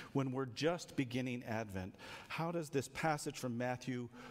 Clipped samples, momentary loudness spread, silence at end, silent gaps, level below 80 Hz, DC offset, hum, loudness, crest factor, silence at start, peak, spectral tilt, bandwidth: under 0.1%; 8 LU; 0 s; none; -70 dBFS; under 0.1%; none; -41 LUFS; 18 dB; 0 s; -22 dBFS; -5.5 dB/octave; 16 kHz